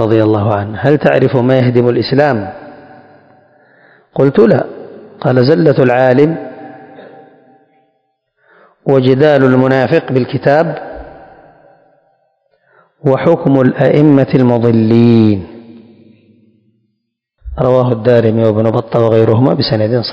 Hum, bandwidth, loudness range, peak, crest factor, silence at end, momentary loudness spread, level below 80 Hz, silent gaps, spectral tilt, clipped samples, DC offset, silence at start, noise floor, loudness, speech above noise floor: none; 7 kHz; 6 LU; 0 dBFS; 12 dB; 0 s; 15 LU; -42 dBFS; none; -9.5 dB/octave; 1%; under 0.1%; 0 s; -69 dBFS; -11 LUFS; 59 dB